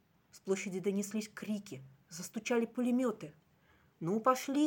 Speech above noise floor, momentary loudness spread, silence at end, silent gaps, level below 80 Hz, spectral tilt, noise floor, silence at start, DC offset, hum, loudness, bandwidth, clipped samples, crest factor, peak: 33 dB; 18 LU; 0 s; none; -82 dBFS; -5 dB/octave; -68 dBFS; 0.35 s; under 0.1%; none; -36 LUFS; 17 kHz; under 0.1%; 22 dB; -14 dBFS